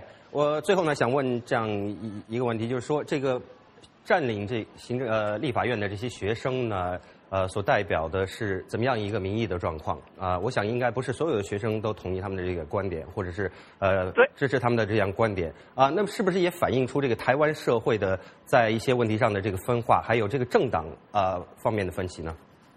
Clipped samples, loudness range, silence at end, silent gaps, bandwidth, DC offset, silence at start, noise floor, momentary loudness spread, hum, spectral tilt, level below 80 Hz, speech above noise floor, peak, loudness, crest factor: under 0.1%; 4 LU; 0.4 s; none; 13.5 kHz; under 0.1%; 0 s; -54 dBFS; 9 LU; none; -6.5 dB/octave; -54 dBFS; 28 dB; -6 dBFS; -27 LUFS; 22 dB